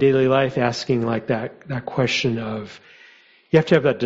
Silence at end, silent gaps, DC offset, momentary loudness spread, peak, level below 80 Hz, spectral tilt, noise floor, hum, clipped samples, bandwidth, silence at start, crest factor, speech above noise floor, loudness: 0 s; none; under 0.1%; 13 LU; -2 dBFS; -54 dBFS; -6 dB/octave; -51 dBFS; none; under 0.1%; 8 kHz; 0 s; 18 dB; 31 dB; -21 LUFS